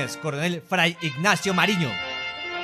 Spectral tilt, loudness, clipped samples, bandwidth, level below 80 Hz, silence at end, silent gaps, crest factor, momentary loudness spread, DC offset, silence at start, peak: -4 dB/octave; -23 LUFS; under 0.1%; 14.5 kHz; -60 dBFS; 0 s; none; 20 dB; 8 LU; under 0.1%; 0 s; -6 dBFS